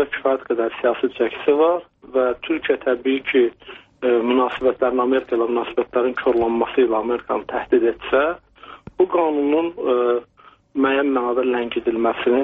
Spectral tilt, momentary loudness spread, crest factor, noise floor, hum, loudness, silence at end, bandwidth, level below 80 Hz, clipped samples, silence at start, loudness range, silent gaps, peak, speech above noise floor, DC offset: -2.5 dB/octave; 6 LU; 14 dB; -41 dBFS; none; -20 LUFS; 0 s; 4 kHz; -54 dBFS; under 0.1%; 0 s; 1 LU; none; -4 dBFS; 22 dB; under 0.1%